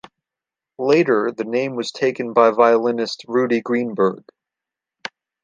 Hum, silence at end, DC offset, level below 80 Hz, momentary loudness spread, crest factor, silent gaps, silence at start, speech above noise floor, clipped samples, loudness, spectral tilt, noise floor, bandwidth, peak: none; 1.25 s; under 0.1%; -70 dBFS; 19 LU; 18 dB; none; 0.8 s; 69 dB; under 0.1%; -19 LUFS; -5.5 dB/octave; -88 dBFS; 9 kHz; -2 dBFS